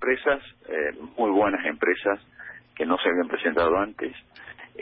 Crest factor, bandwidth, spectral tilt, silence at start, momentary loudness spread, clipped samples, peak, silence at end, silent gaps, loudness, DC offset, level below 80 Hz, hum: 16 dB; 4.9 kHz; -9 dB/octave; 0 s; 20 LU; under 0.1%; -10 dBFS; 0.05 s; none; -25 LUFS; under 0.1%; -58 dBFS; none